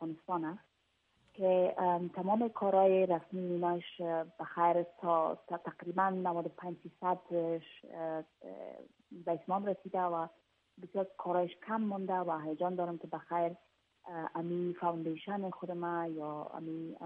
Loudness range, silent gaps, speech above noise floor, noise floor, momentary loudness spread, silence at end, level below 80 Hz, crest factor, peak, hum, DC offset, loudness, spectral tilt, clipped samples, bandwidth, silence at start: 7 LU; none; 40 dB; -75 dBFS; 13 LU; 0 s; -84 dBFS; 18 dB; -18 dBFS; none; under 0.1%; -36 LUFS; -9.5 dB/octave; under 0.1%; 4.2 kHz; 0 s